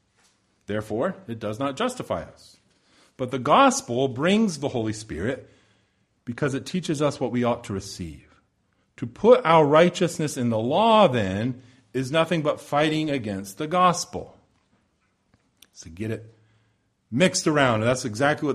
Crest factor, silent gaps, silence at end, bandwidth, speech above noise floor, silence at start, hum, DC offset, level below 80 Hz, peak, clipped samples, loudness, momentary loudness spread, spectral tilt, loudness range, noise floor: 22 dB; none; 0 s; 14 kHz; 46 dB; 0.7 s; none; under 0.1%; -56 dBFS; -4 dBFS; under 0.1%; -23 LUFS; 16 LU; -5 dB/octave; 9 LU; -69 dBFS